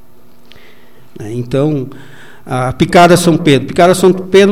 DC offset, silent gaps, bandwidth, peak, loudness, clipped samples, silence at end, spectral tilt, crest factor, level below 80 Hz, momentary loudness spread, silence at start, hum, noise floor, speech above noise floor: 3%; none; 16.5 kHz; 0 dBFS; -10 LUFS; 0.2%; 0 s; -5.5 dB/octave; 12 dB; -40 dBFS; 16 LU; 1.2 s; none; -46 dBFS; 36 dB